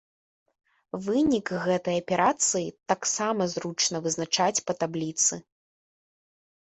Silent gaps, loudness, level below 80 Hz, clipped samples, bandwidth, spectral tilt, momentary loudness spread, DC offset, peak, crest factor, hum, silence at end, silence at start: none; -26 LUFS; -64 dBFS; under 0.1%; 8.6 kHz; -3 dB/octave; 6 LU; under 0.1%; -10 dBFS; 18 dB; none; 1.25 s; 0.95 s